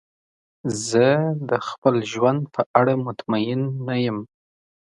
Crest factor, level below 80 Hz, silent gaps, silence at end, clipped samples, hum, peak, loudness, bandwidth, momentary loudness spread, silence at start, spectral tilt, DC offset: 22 dB; -64 dBFS; 1.78-1.82 s, 2.66-2.74 s; 0.6 s; under 0.1%; none; 0 dBFS; -22 LUFS; 11.5 kHz; 8 LU; 0.65 s; -6 dB/octave; under 0.1%